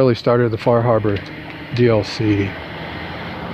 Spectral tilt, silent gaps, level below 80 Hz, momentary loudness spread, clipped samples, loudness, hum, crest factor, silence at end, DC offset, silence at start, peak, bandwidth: -7.5 dB/octave; none; -44 dBFS; 13 LU; under 0.1%; -18 LUFS; none; 16 dB; 0 s; under 0.1%; 0 s; -2 dBFS; 8.4 kHz